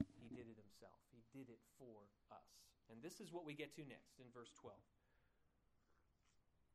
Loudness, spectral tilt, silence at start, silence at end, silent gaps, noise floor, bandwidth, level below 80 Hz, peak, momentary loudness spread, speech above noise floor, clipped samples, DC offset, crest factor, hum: -59 LUFS; -5 dB/octave; 0 s; 0.1 s; none; -81 dBFS; 13 kHz; -84 dBFS; -30 dBFS; 13 LU; 23 dB; under 0.1%; under 0.1%; 30 dB; none